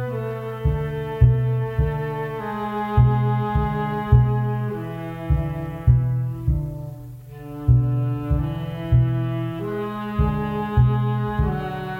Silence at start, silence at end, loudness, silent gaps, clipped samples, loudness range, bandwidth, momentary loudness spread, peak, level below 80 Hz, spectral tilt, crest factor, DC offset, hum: 0 s; 0 s; -22 LUFS; none; under 0.1%; 2 LU; 4.2 kHz; 10 LU; -2 dBFS; -30 dBFS; -9.5 dB/octave; 18 dB; under 0.1%; none